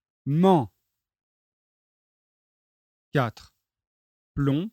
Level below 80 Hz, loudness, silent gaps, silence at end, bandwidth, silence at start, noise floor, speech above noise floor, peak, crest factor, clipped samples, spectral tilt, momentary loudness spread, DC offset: -56 dBFS; -24 LUFS; 1.23-3.12 s, 3.87-4.35 s; 0.05 s; 13.5 kHz; 0.25 s; under -90 dBFS; over 67 dB; -8 dBFS; 20 dB; under 0.1%; -8.5 dB/octave; 14 LU; under 0.1%